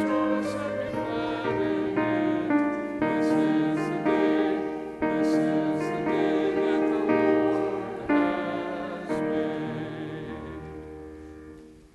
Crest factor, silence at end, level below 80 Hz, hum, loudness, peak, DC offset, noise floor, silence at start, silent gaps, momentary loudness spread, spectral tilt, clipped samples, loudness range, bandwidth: 16 dB; 0.15 s; -56 dBFS; none; -26 LUFS; -10 dBFS; under 0.1%; -47 dBFS; 0 s; none; 14 LU; -7 dB/octave; under 0.1%; 5 LU; 11.5 kHz